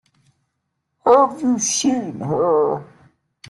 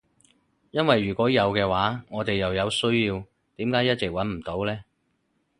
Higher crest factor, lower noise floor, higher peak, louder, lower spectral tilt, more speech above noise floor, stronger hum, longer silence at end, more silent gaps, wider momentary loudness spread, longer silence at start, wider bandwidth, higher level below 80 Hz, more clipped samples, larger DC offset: about the same, 18 dB vs 22 dB; about the same, -75 dBFS vs -72 dBFS; about the same, -2 dBFS vs -4 dBFS; first, -18 LUFS vs -25 LUFS; second, -4 dB/octave vs -5.5 dB/octave; first, 55 dB vs 48 dB; neither; about the same, 0.65 s vs 0.75 s; neither; about the same, 10 LU vs 9 LU; first, 1.05 s vs 0.75 s; about the same, 12 kHz vs 11.5 kHz; second, -62 dBFS vs -50 dBFS; neither; neither